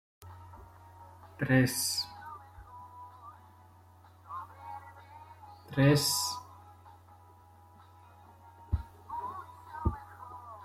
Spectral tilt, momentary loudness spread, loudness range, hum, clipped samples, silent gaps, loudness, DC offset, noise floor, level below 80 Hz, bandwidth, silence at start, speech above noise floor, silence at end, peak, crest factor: -4.5 dB/octave; 27 LU; 13 LU; none; under 0.1%; none; -31 LUFS; under 0.1%; -57 dBFS; -50 dBFS; 16 kHz; 0.2 s; 30 dB; 0 s; -14 dBFS; 22 dB